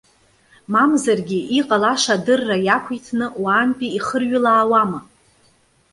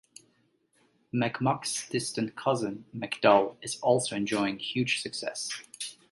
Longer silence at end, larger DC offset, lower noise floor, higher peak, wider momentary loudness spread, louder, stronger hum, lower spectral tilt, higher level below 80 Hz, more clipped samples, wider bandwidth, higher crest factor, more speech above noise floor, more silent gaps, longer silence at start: first, 0.9 s vs 0.2 s; neither; second, -58 dBFS vs -70 dBFS; first, -2 dBFS vs -8 dBFS; second, 8 LU vs 12 LU; first, -18 LUFS vs -29 LUFS; neither; about the same, -4 dB/octave vs -4 dB/octave; first, -62 dBFS vs -70 dBFS; neither; about the same, 11.5 kHz vs 11.5 kHz; about the same, 18 dB vs 22 dB; about the same, 40 dB vs 41 dB; neither; second, 0.7 s vs 1.15 s